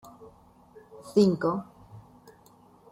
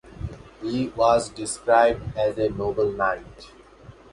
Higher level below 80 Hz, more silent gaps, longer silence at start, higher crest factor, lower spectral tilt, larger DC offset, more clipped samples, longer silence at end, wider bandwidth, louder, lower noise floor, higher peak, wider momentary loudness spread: second, -66 dBFS vs -46 dBFS; neither; first, 0.2 s vs 0.05 s; about the same, 22 dB vs 20 dB; first, -7.5 dB/octave vs -5 dB/octave; neither; neither; first, 0.9 s vs 0.2 s; first, 14 kHz vs 11.5 kHz; second, -26 LUFS vs -23 LUFS; first, -57 dBFS vs -47 dBFS; second, -10 dBFS vs -4 dBFS; first, 25 LU vs 16 LU